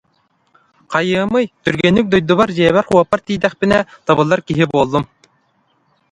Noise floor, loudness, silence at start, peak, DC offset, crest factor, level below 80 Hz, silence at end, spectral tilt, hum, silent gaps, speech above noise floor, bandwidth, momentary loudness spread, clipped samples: -61 dBFS; -15 LUFS; 0.9 s; 0 dBFS; under 0.1%; 16 dB; -46 dBFS; 1.05 s; -6.5 dB/octave; none; none; 47 dB; 11 kHz; 6 LU; under 0.1%